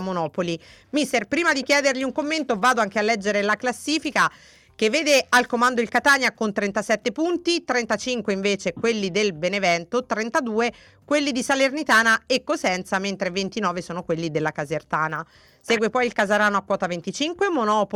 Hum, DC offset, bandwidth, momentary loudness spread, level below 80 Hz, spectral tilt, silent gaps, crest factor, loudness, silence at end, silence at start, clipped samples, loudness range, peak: none; under 0.1%; 18 kHz; 8 LU; -60 dBFS; -3.5 dB/octave; none; 16 dB; -22 LUFS; 0 s; 0 s; under 0.1%; 3 LU; -8 dBFS